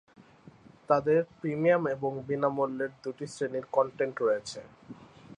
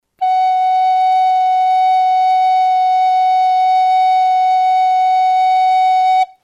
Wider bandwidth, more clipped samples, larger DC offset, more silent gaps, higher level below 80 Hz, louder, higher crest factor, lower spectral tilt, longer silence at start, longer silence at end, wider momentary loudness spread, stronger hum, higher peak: first, 10 kHz vs 7.2 kHz; neither; neither; neither; first, -70 dBFS vs -78 dBFS; second, -29 LUFS vs -13 LUFS; first, 20 dB vs 6 dB; first, -6.5 dB/octave vs 2.5 dB/octave; about the same, 0.2 s vs 0.2 s; about the same, 0.05 s vs 0.15 s; first, 18 LU vs 1 LU; neither; second, -10 dBFS vs -6 dBFS